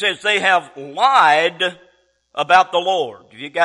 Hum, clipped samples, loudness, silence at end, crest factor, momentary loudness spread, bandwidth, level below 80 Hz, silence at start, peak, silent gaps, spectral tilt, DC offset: none; under 0.1%; -16 LUFS; 0 s; 16 dB; 15 LU; 11.5 kHz; -62 dBFS; 0 s; -2 dBFS; none; -2.5 dB/octave; under 0.1%